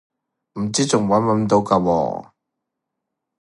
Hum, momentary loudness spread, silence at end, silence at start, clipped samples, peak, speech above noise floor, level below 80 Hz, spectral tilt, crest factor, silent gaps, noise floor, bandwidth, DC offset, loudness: none; 11 LU; 1.2 s; 0.55 s; under 0.1%; 0 dBFS; 62 dB; -52 dBFS; -5.5 dB/octave; 20 dB; none; -80 dBFS; 11.5 kHz; under 0.1%; -19 LUFS